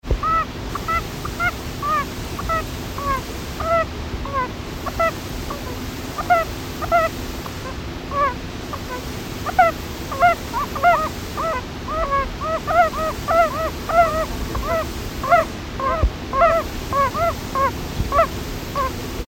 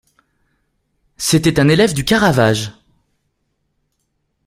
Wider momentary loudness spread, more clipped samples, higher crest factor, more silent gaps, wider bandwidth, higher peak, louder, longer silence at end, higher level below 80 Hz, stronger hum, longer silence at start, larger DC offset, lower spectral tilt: about the same, 11 LU vs 9 LU; neither; about the same, 18 dB vs 18 dB; neither; about the same, 17 kHz vs 16 kHz; second, -4 dBFS vs 0 dBFS; second, -22 LUFS vs -14 LUFS; second, 0.05 s vs 1.75 s; first, -32 dBFS vs -44 dBFS; neither; second, 0.05 s vs 1.2 s; neither; about the same, -5 dB/octave vs -5 dB/octave